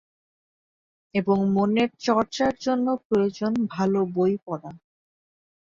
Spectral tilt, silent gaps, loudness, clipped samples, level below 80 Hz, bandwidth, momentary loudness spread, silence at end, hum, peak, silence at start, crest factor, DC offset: -6.5 dB/octave; 3.05-3.10 s; -24 LUFS; under 0.1%; -62 dBFS; 7.4 kHz; 8 LU; 0.9 s; none; -8 dBFS; 1.15 s; 16 dB; under 0.1%